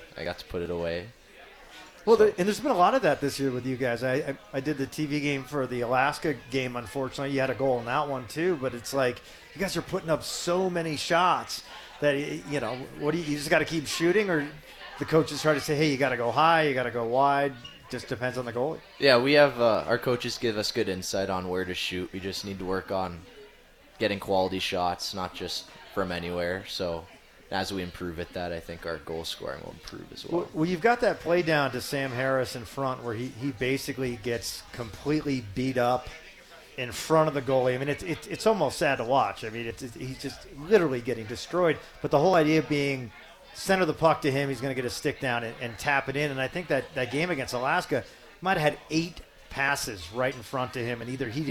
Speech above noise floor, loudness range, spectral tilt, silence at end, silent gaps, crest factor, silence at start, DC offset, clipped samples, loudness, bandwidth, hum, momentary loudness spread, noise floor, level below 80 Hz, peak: 27 dB; 6 LU; -5 dB/octave; 0 s; none; 22 dB; 0 s; under 0.1%; under 0.1%; -28 LUFS; 18.5 kHz; none; 13 LU; -55 dBFS; -56 dBFS; -6 dBFS